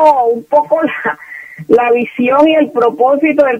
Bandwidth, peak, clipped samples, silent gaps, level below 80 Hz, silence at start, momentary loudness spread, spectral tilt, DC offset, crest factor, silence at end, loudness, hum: 9.2 kHz; 0 dBFS; 0.1%; none; -56 dBFS; 0 s; 10 LU; -6.5 dB/octave; under 0.1%; 12 dB; 0 s; -12 LUFS; none